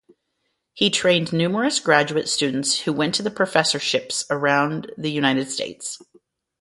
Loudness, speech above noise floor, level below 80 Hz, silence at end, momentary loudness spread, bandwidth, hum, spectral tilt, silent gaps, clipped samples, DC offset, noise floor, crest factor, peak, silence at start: -21 LUFS; 53 dB; -64 dBFS; 0.6 s; 9 LU; 11.5 kHz; none; -3.5 dB/octave; none; under 0.1%; under 0.1%; -74 dBFS; 22 dB; 0 dBFS; 0.75 s